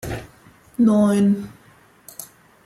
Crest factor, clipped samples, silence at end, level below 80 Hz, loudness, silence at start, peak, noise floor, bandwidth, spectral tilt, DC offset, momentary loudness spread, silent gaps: 16 dB; under 0.1%; 0.4 s; -50 dBFS; -18 LUFS; 0.05 s; -6 dBFS; -52 dBFS; 14.5 kHz; -7 dB/octave; under 0.1%; 22 LU; none